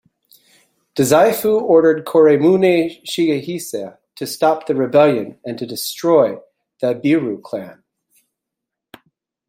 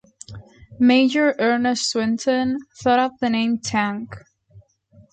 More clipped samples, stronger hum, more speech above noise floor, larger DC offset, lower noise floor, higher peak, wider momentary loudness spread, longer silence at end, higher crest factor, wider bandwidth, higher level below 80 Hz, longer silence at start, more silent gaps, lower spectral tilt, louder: neither; neither; first, 67 dB vs 34 dB; neither; first, -82 dBFS vs -53 dBFS; first, -2 dBFS vs -6 dBFS; about the same, 16 LU vs 17 LU; first, 1.75 s vs 0.5 s; about the same, 16 dB vs 16 dB; first, 16.5 kHz vs 9.2 kHz; about the same, -62 dBFS vs -58 dBFS; first, 0.95 s vs 0.3 s; neither; first, -5.5 dB/octave vs -4 dB/octave; first, -16 LUFS vs -20 LUFS